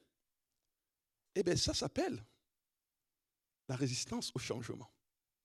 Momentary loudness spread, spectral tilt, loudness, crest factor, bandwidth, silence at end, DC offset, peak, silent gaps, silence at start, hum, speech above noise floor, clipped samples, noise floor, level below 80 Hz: 15 LU; -4 dB/octave; -38 LUFS; 20 dB; 14.5 kHz; 0.55 s; under 0.1%; -22 dBFS; none; 1.35 s; none; over 52 dB; under 0.1%; under -90 dBFS; -62 dBFS